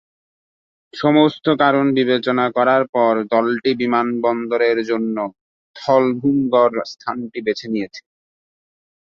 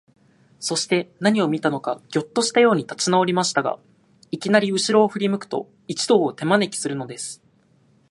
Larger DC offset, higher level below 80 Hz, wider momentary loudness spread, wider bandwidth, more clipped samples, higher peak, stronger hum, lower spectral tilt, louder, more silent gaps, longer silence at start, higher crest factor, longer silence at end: neither; first, -64 dBFS vs -70 dBFS; about the same, 11 LU vs 12 LU; second, 7 kHz vs 11.5 kHz; neither; about the same, -2 dBFS vs 0 dBFS; neither; first, -6.5 dB/octave vs -4 dB/octave; first, -18 LUFS vs -21 LUFS; first, 2.89-2.93 s, 5.41-5.74 s vs none; first, 0.95 s vs 0.6 s; second, 16 dB vs 22 dB; first, 1.1 s vs 0.75 s